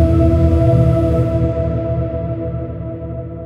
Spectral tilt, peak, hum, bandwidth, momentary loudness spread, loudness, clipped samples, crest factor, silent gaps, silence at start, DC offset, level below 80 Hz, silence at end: -10.5 dB/octave; -2 dBFS; none; 5.6 kHz; 13 LU; -16 LUFS; under 0.1%; 14 dB; none; 0 s; under 0.1%; -22 dBFS; 0 s